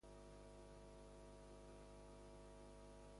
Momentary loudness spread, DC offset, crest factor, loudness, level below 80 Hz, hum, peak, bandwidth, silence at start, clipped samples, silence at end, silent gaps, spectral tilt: 0 LU; under 0.1%; 10 dB; -62 LUFS; -66 dBFS; 50 Hz at -65 dBFS; -50 dBFS; 11.5 kHz; 0 s; under 0.1%; 0 s; none; -5.5 dB/octave